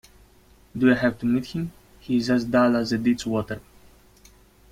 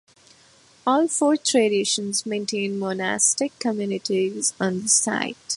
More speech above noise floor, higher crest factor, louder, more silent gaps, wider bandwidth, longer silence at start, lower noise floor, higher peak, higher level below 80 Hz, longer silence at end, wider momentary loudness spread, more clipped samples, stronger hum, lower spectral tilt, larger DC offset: about the same, 33 dB vs 32 dB; about the same, 18 dB vs 18 dB; about the same, -23 LUFS vs -22 LUFS; neither; first, 14.5 kHz vs 11.5 kHz; about the same, 0.75 s vs 0.85 s; about the same, -55 dBFS vs -54 dBFS; about the same, -6 dBFS vs -4 dBFS; first, -52 dBFS vs -70 dBFS; first, 1.1 s vs 0 s; first, 15 LU vs 7 LU; neither; neither; first, -6.5 dB/octave vs -2.5 dB/octave; neither